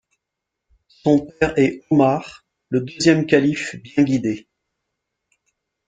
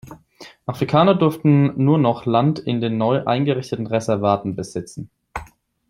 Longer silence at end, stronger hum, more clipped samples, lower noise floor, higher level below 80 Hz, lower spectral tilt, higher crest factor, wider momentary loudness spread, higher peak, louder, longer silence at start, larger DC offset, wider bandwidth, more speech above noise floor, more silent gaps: first, 1.5 s vs 0.45 s; neither; neither; first, -82 dBFS vs -45 dBFS; about the same, -52 dBFS vs -52 dBFS; second, -6 dB/octave vs -7.5 dB/octave; about the same, 20 dB vs 18 dB; second, 10 LU vs 18 LU; about the same, -2 dBFS vs -2 dBFS; about the same, -19 LUFS vs -19 LUFS; first, 1.05 s vs 0.05 s; neither; second, 9.2 kHz vs 12.5 kHz; first, 64 dB vs 27 dB; neither